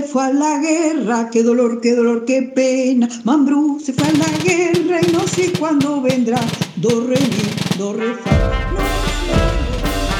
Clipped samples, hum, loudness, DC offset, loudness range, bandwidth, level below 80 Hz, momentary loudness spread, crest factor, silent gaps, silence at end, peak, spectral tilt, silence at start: under 0.1%; none; -16 LUFS; under 0.1%; 2 LU; 18.5 kHz; -28 dBFS; 5 LU; 14 dB; none; 0 s; -2 dBFS; -5.5 dB/octave; 0 s